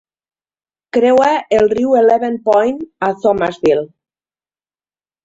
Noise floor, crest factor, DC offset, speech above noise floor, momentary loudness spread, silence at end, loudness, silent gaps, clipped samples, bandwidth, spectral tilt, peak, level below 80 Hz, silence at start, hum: under -90 dBFS; 14 dB; under 0.1%; over 77 dB; 8 LU; 1.4 s; -14 LUFS; none; under 0.1%; 7.8 kHz; -6 dB/octave; -2 dBFS; -52 dBFS; 0.95 s; none